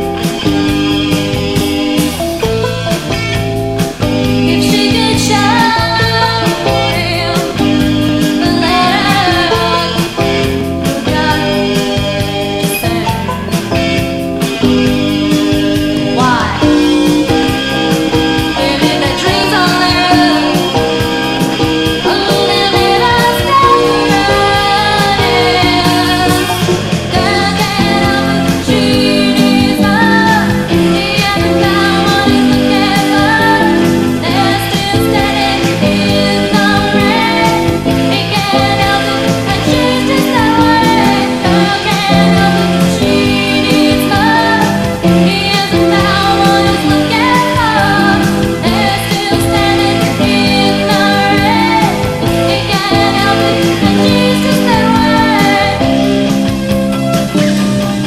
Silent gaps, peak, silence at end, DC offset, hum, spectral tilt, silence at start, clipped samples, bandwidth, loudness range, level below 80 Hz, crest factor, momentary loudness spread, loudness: none; 0 dBFS; 0 s; under 0.1%; none; -5 dB/octave; 0 s; under 0.1%; 16.5 kHz; 3 LU; -30 dBFS; 10 dB; 5 LU; -10 LUFS